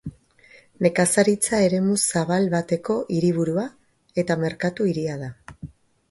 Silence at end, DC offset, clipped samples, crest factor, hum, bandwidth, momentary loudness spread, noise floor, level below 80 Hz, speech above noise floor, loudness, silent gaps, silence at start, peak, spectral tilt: 0.45 s; under 0.1%; under 0.1%; 20 dB; none; 12 kHz; 18 LU; -53 dBFS; -56 dBFS; 31 dB; -22 LUFS; none; 0.05 s; -4 dBFS; -5 dB/octave